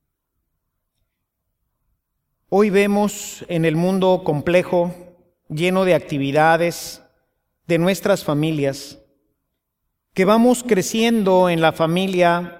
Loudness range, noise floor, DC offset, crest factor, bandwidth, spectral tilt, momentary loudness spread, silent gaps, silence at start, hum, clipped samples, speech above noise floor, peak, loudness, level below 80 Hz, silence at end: 5 LU; -76 dBFS; under 0.1%; 18 dB; 16.5 kHz; -5.5 dB/octave; 10 LU; none; 2.5 s; none; under 0.1%; 59 dB; -2 dBFS; -18 LUFS; -56 dBFS; 0 s